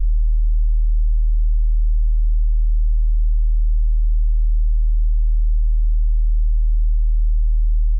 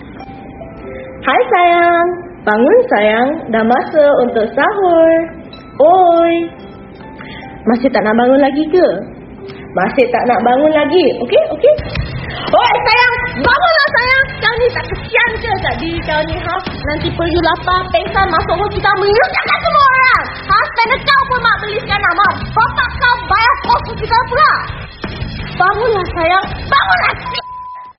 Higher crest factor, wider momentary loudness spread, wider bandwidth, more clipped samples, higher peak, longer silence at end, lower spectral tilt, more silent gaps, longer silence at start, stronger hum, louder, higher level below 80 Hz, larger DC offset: second, 4 dB vs 12 dB; second, 0 LU vs 15 LU; second, 0.2 kHz vs 6 kHz; neither; second, -10 dBFS vs 0 dBFS; about the same, 0 s vs 0.1 s; first, -17.5 dB/octave vs -2.5 dB/octave; neither; about the same, 0 s vs 0 s; neither; second, -21 LUFS vs -12 LUFS; first, -14 dBFS vs -32 dBFS; neither